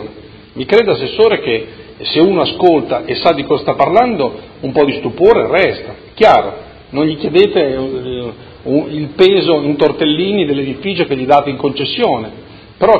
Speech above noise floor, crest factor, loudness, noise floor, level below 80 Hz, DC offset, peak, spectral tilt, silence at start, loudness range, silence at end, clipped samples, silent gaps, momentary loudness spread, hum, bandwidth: 22 dB; 12 dB; -13 LUFS; -35 dBFS; -44 dBFS; under 0.1%; 0 dBFS; -7.5 dB/octave; 0 s; 2 LU; 0 s; 0.3%; none; 14 LU; none; 8 kHz